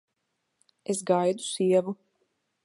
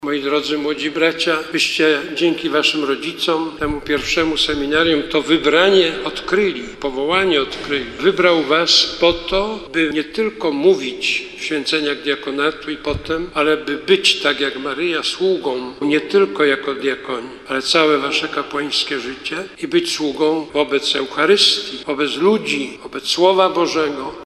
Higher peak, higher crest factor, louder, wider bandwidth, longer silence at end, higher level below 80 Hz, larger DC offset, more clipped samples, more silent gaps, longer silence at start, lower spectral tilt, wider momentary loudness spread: second, -10 dBFS vs -2 dBFS; about the same, 20 dB vs 16 dB; second, -26 LUFS vs -17 LUFS; second, 11.5 kHz vs 14 kHz; first, 0.7 s vs 0 s; second, -80 dBFS vs -44 dBFS; neither; neither; neither; first, 0.9 s vs 0 s; first, -5 dB/octave vs -3 dB/octave; first, 15 LU vs 9 LU